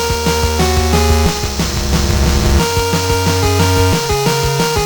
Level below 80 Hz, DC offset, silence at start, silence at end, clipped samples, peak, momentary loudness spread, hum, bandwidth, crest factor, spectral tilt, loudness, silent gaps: -20 dBFS; under 0.1%; 0 s; 0 s; under 0.1%; 0 dBFS; 3 LU; none; over 20 kHz; 12 dB; -4.5 dB/octave; -14 LUFS; none